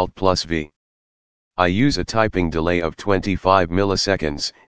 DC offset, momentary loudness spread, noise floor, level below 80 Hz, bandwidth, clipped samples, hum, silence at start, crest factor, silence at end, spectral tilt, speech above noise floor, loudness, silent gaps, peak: 2%; 8 LU; under -90 dBFS; -40 dBFS; 9.8 kHz; under 0.1%; none; 0 s; 20 dB; 0.05 s; -5 dB/octave; over 71 dB; -20 LUFS; 0.76-1.51 s; 0 dBFS